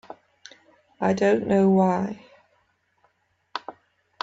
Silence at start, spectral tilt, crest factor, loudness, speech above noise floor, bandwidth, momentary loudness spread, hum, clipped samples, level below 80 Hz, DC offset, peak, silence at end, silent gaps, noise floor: 1 s; -7.5 dB/octave; 18 dB; -22 LUFS; 48 dB; 7.8 kHz; 22 LU; none; under 0.1%; -64 dBFS; under 0.1%; -8 dBFS; 0.5 s; none; -68 dBFS